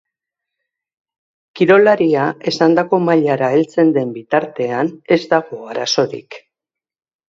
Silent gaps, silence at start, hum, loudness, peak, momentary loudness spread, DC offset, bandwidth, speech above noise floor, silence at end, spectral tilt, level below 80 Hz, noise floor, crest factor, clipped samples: none; 1.55 s; none; -15 LUFS; 0 dBFS; 9 LU; under 0.1%; 7.6 kHz; 72 dB; 0.9 s; -5.5 dB/octave; -64 dBFS; -86 dBFS; 16 dB; under 0.1%